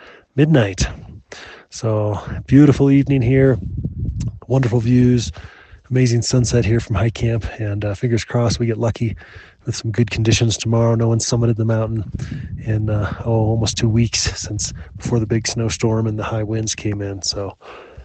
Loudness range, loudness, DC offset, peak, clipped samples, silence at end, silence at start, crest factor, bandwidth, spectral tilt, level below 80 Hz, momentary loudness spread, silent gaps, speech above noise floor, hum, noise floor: 4 LU; -18 LUFS; under 0.1%; 0 dBFS; under 0.1%; 0 s; 0 s; 18 dB; 8.8 kHz; -6 dB/octave; -36 dBFS; 13 LU; none; 21 dB; none; -39 dBFS